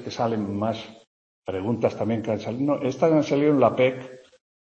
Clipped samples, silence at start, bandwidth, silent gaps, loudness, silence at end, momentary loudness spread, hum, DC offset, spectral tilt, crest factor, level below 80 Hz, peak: under 0.1%; 0 s; 8 kHz; 1.07-1.43 s; -24 LUFS; 0.5 s; 15 LU; none; under 0.1%; -7 dB/octave; 18 dB; -64 dBFS; -6 dBFS